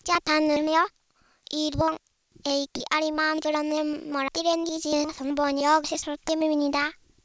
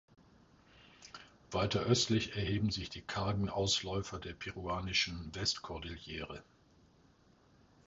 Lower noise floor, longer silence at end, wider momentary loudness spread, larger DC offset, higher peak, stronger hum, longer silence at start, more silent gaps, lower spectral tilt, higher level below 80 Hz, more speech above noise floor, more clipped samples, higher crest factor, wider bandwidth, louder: second, -54 dBFS vs -66 dBFS; second, 0.3 s vs 1.45 s; second, 7 LU vs 18 LU; neither; first, -8 dBFS vs -16 dBFS; neither; second, 0.05 s vs 0.8 s; neither; about the same, -3.5 dB/octave vs -4 dB/octave; about the same, -54 dBFS vs -54 dBFS; about the same, 29 dB vs 30 dB; neither; about the same, 18 dB vs 22 dB; about the same, 8 kHz vs 7.6 kHz; first, -26 LUFS vs -36 LUFS